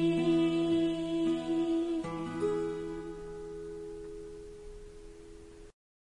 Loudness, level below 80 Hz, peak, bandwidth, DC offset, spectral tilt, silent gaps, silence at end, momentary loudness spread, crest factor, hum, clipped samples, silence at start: -33 LUFS; -56 dBFS; -20 dBFS; 10.5 kHz; under 0.1%; -7 dB/octave; none; 0.3 s; 23 LU; 14 dB; none; under 0.1%; 0 s